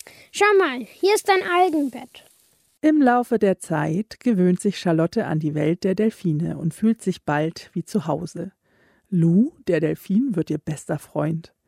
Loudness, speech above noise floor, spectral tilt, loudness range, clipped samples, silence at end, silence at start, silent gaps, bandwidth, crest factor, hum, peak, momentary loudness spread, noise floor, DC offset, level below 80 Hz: -22 LUFS; 40 dB; -6.5 dB/octave; 3 LU; under 0.1%; 0.25 s; 0.35 s; none; 15.5 kHz; 16 dB; none; -6 dBFS; 10 LU; -61 dBFS; under 0.1%; -62 dBFS